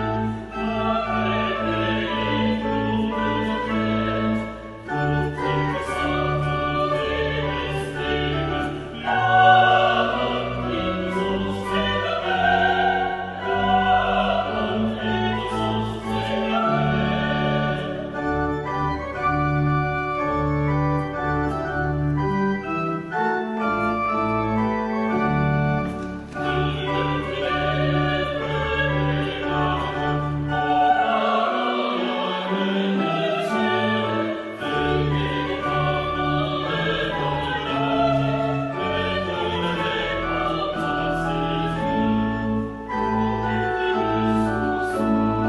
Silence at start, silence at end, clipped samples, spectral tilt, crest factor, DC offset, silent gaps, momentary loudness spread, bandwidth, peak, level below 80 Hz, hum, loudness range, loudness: 0 s; 0 s; under 0.1%; -7 dB/octave; 18 dB; under 0.1%; none; 6 LU; 11.5 kHz; -4 dBFS; -40 dBFS; none; 4 LU; -22 LUFS